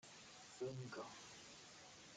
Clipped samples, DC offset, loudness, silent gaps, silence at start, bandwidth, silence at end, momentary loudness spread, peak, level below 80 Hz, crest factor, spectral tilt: under 0.1%; under 0.1%; -54 LUFS; none; 0 s; 11 kHz; 0 s; 9 LU; -38 dBFS; -82 dBFS; 18 dB; -4 dB/octave